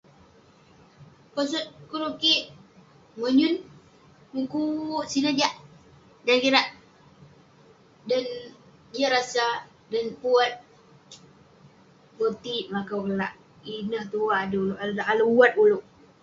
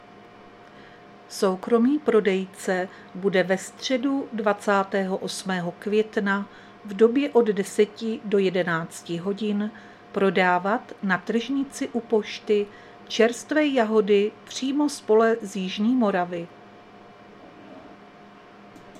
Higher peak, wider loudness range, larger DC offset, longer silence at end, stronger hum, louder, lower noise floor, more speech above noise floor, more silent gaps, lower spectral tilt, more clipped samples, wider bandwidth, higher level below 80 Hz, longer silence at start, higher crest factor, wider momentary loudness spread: about the same, -4 dBFS vs -6 dBFS; about the same, 5 LU vs 3 LU; neither; first, 0.4 s vs 0 s; neither; about the same, -25 LUFS vs -24 LUFS; first, -56 dBFS vs -48 dBFS; first, 31 dB vs 24 dB; neither; about the same, -4 dB/octave vs -5 dB/octave; neither; second, 7.8 kHz vs 13.5 kHz; about the same, -68 dBFS vs -70 dBFS; first, 1 s vs 0.15 s; about the same, 24 dB vs 20 dB; first, 15 LU vs 10 LU